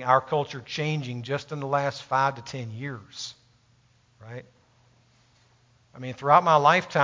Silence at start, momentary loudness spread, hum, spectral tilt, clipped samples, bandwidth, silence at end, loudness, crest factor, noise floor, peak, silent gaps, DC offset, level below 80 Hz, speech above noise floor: 0 s; 20 LU; none; -5 dB/octave; under 0.1%; 7.6 kHz; 0 s; -25 LUFS; 22 dB; -62 dBFS; -4 dBFS; none; under 0.1%; -68 dBFS; 37 dB